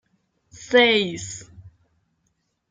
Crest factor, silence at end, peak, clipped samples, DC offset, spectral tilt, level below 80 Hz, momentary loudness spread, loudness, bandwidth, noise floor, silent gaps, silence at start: 22 dB; 1 s; -4 dBFS; under 0.1%; under 0.1%; -3 dB/octave; -62 dBFS; 19 LU; -18 LUFS; 9.4 kHz; -72 dBFS; none; 0.6 s